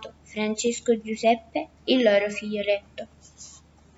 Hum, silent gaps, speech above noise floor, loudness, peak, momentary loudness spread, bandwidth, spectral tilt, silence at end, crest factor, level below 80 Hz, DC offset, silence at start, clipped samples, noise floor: none; none; 27 dB; -25 LUFS; -8 dBFS; 23 LU; 8 kHz; -3.5 dB/octave; 0.4 s; 18 dB; -62 dBFS; under 0.1%; 0 s; under 0.1%; -52 dBFS